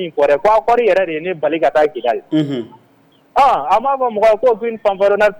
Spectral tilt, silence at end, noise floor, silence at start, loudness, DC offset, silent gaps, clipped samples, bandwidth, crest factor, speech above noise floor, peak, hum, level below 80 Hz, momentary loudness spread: -6 dB/octave; 0 s; -52 dBFS; 0 s; -15 LUFS; under 0.1%; none; under 0.1%; 19 kHz; 10 dB; 38 dB; -4 dBFS; none; -48 dBFS; 7 LU